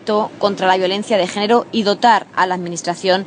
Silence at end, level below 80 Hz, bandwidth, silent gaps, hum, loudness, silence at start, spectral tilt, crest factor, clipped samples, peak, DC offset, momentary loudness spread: 0 s; -66 dBFS; 10 kHz; none; none; -16 LUFS; 0.05 s; -4 dB/octave; 16 dB; under 0.1%; 0 dBFS; under 0.1%; 6 LU